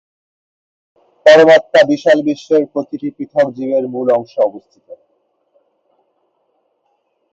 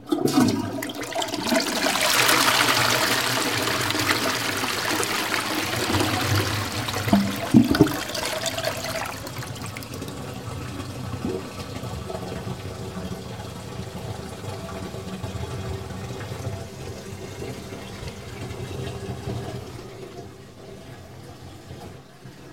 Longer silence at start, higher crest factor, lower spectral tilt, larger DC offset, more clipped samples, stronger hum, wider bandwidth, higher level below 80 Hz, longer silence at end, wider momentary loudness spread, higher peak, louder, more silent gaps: first, 1.25 s vs 0 s; second, 16 dB vs 26 dB; first, -5 dB/octave vs -3.5 dB/octave; second, under 0.1% vs 0.2%; neither; neither; second, 7.8 kHz vs 17 kHz; second, -64 dBFS vs -50 dBFS; first, 2.4 s vs 0 s; second, 13 LU vs 20 LU; about the same, 0 dBFS vs 0 dBFS; first, -13 LUFS vs -24 LUFS; neither